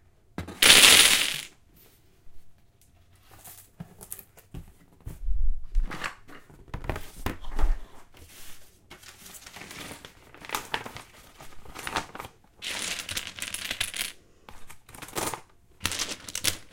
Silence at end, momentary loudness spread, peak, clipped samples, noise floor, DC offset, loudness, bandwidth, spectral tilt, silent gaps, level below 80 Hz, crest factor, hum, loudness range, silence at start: 0.05 s; 27 LU; 0 dBFS; under 0.1%; -58 dBFS; under 0.1%; -23 LUFS; 17 kHz; -0.5 dB/octave; none; -36 dBFS; 28 dB; none; 21 LU; 0.4 s